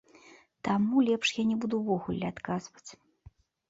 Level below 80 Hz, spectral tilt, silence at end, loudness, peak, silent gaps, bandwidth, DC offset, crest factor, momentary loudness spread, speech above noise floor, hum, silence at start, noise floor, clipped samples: -64 dBFS; -5.5 dB/octave; 0.75 s; -30 LUFS; -14 dBFS; none; 7.8 kHz; under 0.1%; 16 dB; 17 LU; 29 dB; none; 0.65 s; -58 dBFS; under 0.1%